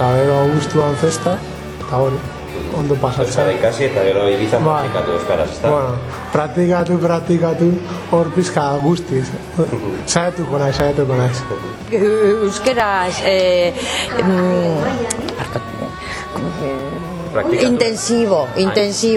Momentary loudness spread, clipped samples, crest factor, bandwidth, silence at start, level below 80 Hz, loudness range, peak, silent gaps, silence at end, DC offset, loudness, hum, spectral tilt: 9 LU; under 0.1%; 16 dB; 15.5 kHz; 0 s; -40 dBFS; 3 LU; 0 dBFS; none; 0 s; under 0.1%; -17 LUFS; none; -5.5 dB/octave